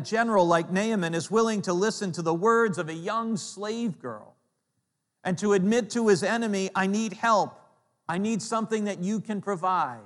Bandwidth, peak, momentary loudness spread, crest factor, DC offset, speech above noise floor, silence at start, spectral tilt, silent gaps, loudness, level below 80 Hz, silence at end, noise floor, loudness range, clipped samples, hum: 12 kHz; -10 dBFS; 10 LU; 18 dB; under 0.1%; 53 dB; 0 s; -5 dB/octave; none; -26 LUFS; -76 dBFS; 0 s; -79 dBFS; 4 LU; under 0.1%; none